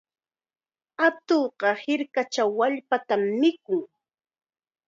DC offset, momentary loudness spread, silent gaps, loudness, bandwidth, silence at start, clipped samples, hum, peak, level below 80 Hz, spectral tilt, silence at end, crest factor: under 0.1%; 7 LU; none; -25 LUFS; 7.6 kHz; 1 s; under 0.1%; none; -8 dBFS; -82 dBFS; -4.5 dB/octave; 1 s; 20 dB